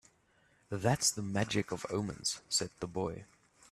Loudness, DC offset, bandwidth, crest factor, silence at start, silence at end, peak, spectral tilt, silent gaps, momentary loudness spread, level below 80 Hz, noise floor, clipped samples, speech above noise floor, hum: -34 LUFS; under 0.1%; 14.5 kHz; 20 dB; 0.7 s; 0.5 s; -16 dBFS; -3.5 dB/octave; none; 10 LU; -64 dBFS; -70 dBFS; under 0.1%; 35 dB; none